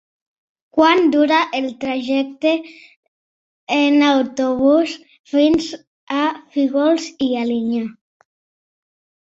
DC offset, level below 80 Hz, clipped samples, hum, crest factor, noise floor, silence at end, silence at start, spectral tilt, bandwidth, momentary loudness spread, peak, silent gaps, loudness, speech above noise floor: under 0.1%; -58 dBFS; under 0.1%; none; 18 dB; under -90 dBFS; 1.35 s; 0.75 s; -4 dB/octave; 7.8 kHz; 10 LU; -2 dBFS; 2.96-3.67 s, 5.19-5.24 s, 5.87-6.07 s; -17 LUFS; over 73 dB